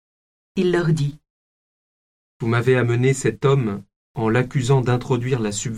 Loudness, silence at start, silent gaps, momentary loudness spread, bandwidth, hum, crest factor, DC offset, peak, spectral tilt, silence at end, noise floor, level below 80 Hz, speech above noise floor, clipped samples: -20 LUFS; 0.55 s; 1.30-2.40 s, 3.96-4.14 s; 9 LU; 11.5 kHz; none; 16 dB; under 0.1%; -6 dBFS; -6.5 dB/octave; 0 s; under -90 dBFS; -48 dBFS; over 71 dB; under 0.1%